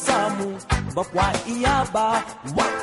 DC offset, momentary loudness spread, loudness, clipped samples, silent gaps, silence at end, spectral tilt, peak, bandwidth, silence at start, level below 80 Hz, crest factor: under 0.1%; 5 LU; -23 LUFS; under 0.1%; none; 0 s; -4.5 dB/octave; -6 dBFS; 11.5 kHz; 0 s; -36 dBFS; 16 dB